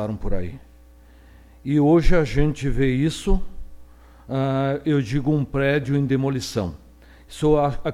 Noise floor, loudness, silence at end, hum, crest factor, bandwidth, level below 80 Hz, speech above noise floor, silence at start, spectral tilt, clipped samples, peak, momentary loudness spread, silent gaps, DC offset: -48 dBFS; -22 LUFS; 0 s; none; 18 dB; 12.5 kHz; -30 dBFS; 28 dB; 0 s; -7 dB/octave; under 0.1%; -4 dBFS; 12 LU; none; under 0.1%